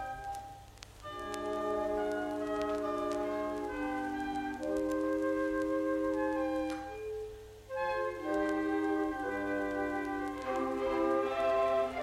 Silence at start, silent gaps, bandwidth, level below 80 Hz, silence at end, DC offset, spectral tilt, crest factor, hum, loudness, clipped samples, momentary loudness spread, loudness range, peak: 0 s; none; 15 kHz; -58 dBFS; 0 s; under 0.1%; -5.5 dB/octave; 16 dB; none; -34 LUFS; under 0.1%; 11 LU; 2 LU; -18 dBFS